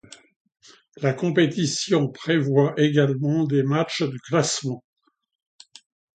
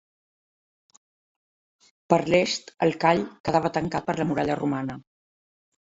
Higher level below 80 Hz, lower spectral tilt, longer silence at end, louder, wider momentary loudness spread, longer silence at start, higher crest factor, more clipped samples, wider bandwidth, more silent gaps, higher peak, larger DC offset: second, -66 dBFS vs -60 dBFS; about the same, -5.5 dB/octave vs -5.5 dB/octave; first, 1.4 s vs 0.95 s; first, -22 LUFS vs -25 LUFS; about the same, 7 LU vs 7 LU; second, 1 s vs 2.1 s; second, 18 dB vs 24 dB; neither; first, 9.4 kHz vs 8 kHz; second, none vs 3.40-3.44 s; about the same, -6 dBFS vs -4 dBFS; neither